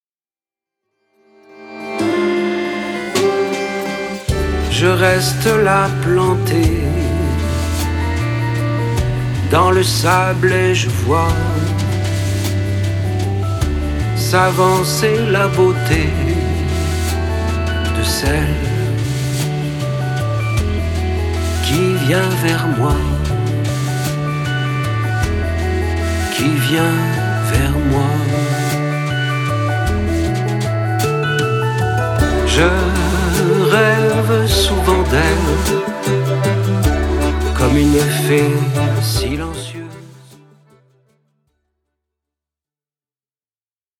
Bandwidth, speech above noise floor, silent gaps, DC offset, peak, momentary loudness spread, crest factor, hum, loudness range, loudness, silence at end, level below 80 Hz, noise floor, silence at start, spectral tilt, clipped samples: 18 kHz; over 76 dB; none; under 0.1%; 0 dBFS; 6 LU; 16 dB; none; 4 LU; -16 LUFS; 3.85 s; -26 dBFS; under -90 dBFS; 1.5 s; -5.5 dB/octave; under 0.1%